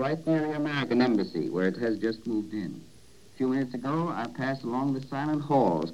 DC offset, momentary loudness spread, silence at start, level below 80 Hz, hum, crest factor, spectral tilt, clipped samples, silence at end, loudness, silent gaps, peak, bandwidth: 0.2%; 7 LU; 0 s; -66 dBFS; none; 16 dB; -7.5 dB/octave; under 0.1%; 0 s; -29 LUFS; none; -12 dBFS; 11.5 kHz